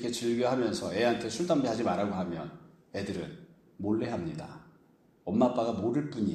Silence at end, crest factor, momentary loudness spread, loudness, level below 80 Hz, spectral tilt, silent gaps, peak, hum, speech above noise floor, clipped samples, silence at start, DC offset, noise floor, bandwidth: 0 s; 18 dB; 15 LU; -31 LUFS; -64 dBFS; -6 dB/octave; none; -12 dBFS; none; 33 dB; under 0.1%; 0 s; under 0.1%; -63 dBFS; 13 kHz